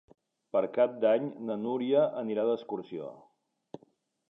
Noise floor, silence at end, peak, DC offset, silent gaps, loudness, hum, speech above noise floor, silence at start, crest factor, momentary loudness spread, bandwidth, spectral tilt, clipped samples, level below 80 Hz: -67 dBFS; 1.1 s; -12 dBFS; under 0.1%; none; -30 LUFS; none; 38 dB; 0.55 s; 18 dB; 23 LU; 5.4 kHz; -8.5 dB/octave; under 0.1%; -82 dBFS